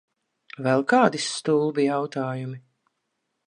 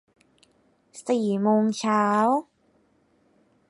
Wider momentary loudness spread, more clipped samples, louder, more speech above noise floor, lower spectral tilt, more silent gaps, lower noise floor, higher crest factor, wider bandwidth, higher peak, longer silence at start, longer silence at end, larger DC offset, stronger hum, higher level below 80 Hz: first, 13 LU vs 7 LU; neither; about the same, -23 LUFS vs -23 LUFS; first, 55 dB vs 42 dB; about the same, -5 dB/octave vs -6 dB/octave; neither; first, -78 dBFS vs -65 dBFS; about the same, 22 dB vs 18 dB; about the same, 11 kHz vs 11.5 kHz; first, -4 dBFS vs -10 dBFS; second, 0.6 s vs 0.95 s; second, 0.9 s vs 1.25 s; neither; neither; about the same, -76 dBFS vs -72 dBFS